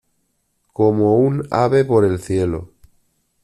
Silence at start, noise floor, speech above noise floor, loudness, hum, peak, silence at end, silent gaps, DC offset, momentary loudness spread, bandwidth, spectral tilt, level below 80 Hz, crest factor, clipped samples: 0.8 s; -67 dBFS; 52 dB; -17 LUFS; none; -4 dBFS; 0.75 s; none; under 0.1%; 9 LU; 12 kHz; -8 dB/octave; -48 dBFS; 16 dB; under 0.1%